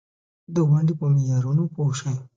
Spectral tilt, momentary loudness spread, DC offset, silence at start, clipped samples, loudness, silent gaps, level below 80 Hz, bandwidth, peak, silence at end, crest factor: -8 dB/octave; 7 LU; under 0.1%; 0.5 s; under 0.1%; -22 LUFS; none; -62 dBFS; 7.6 kHz; -10 dBFS; 0.1 s; 12 dB